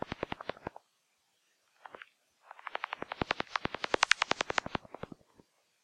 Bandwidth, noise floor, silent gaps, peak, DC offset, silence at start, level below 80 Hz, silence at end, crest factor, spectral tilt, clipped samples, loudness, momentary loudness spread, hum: 15.5 kHz; -76 dBFS; none; -8 dBFS; under 0.1%; 0.1 s; -64 dBFS; 1.05 s; 30 dB; -2.5 dB/octave; under 0.1%; -34 LUFS; 22 LU; none